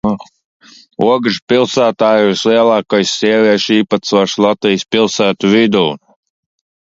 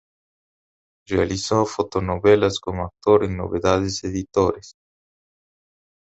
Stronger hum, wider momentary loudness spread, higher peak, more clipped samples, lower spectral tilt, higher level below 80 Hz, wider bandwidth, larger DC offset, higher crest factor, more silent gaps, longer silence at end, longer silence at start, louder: neither; second, 5 LU vs 9 LU; about the same, 0 dBFS vs -2 dBFS; neither; about the same, -4.5 dB/octave vs -5.5 dB/octave; second, -52 dBFS vs -42 dBFS; about the same, 7.8 kHz vs 8.2 kHz; neither; second, 12 dB vs 20 dB; first, 0.45-0.60 s, 1.42-1.47 s vs none; second, 0.9 s vs 1.3 s; second, 0.05 s vs 1.1 s; first, -12 LUFS vs -21 LUFS